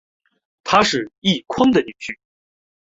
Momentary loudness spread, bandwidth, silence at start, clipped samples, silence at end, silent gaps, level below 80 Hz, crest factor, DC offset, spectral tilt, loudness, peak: 16 LU; 8 kHz; 0.65 s; under 0.1%; 0.75 s; 1.18-1.22 s; -54 dBFS; 20 dB; under 0.1%; -4.5 dB/octave; -18 LUFS; -2 dBFS